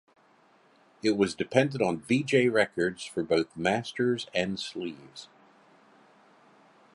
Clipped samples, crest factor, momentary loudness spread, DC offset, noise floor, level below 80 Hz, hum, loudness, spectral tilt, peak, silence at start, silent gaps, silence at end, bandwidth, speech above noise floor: under 0.1%; 22 dB; 13 LU; under 0.1%; -62 dBFS; -66 dBFS; none; -28 LUFS; -5.5 dB/octave; -8 dBFS; 1.05 s; none; 1.7 s; 11.5 kHz; 34 dB